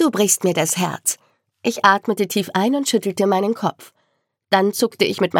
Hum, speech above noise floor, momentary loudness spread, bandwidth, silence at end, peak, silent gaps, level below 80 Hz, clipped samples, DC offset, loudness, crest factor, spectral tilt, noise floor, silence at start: none; 51 dB; 8 LU; 17.5 kHz; 0 s; 0 dBFS; none; -74 dBFS; under 0.1%; under 0.1%; -19 LUFS; 20 dB; -3.5 dB/octave; -70 dBFS; 0 s